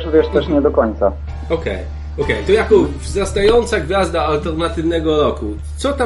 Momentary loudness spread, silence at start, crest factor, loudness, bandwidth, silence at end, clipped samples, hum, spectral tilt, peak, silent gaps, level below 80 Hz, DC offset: 10 LU; 0 s; 16 dB; -16 LUFS; 11.5 kHz; 0 s; under 0.1%; none; -6 dB/octave; 0 dBFS; none; -26 dBFS; under 0.1%